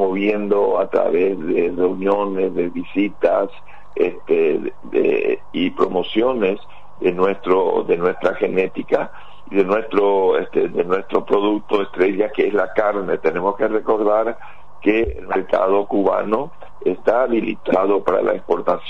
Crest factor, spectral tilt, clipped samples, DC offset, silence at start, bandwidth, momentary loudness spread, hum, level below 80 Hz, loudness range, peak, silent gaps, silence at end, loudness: 14 dB; -7.5 dB/octave; under 0.1%; 3%; 0 s; 6.2 kHz; 5 LU; none; -48 dBFS; 1 LU; -4 dBFS; none; 0 s; -19 LUFS